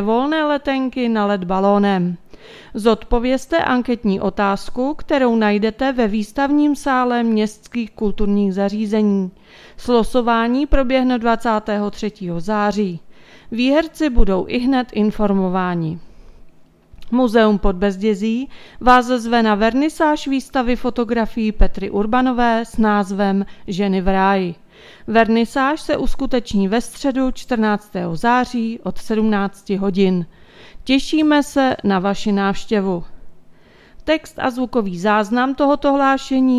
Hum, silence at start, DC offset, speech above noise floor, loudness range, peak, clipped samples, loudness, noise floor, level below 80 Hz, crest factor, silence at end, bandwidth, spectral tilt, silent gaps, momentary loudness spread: none; 0 s; under 0.1%; 28 dB; 3 LU; 0 dBFS; under 0.1%; -18 LUFS; -45 dBFS; -32 dBFS; 18 dB; 0 s; 13.5 kHz; -6 dB/octave; none; 8 LU